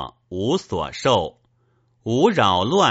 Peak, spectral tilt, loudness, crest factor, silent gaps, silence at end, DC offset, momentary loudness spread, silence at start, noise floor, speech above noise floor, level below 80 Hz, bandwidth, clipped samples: -2 dBFS; -3.5 dB/octave; -20 LUFS; 18 dB; none; 0 s; under 0.1%; 15 LU; 0 s; -63 dBFS; 44 dB; -50 dBFS; 8 kHz; under 0.1%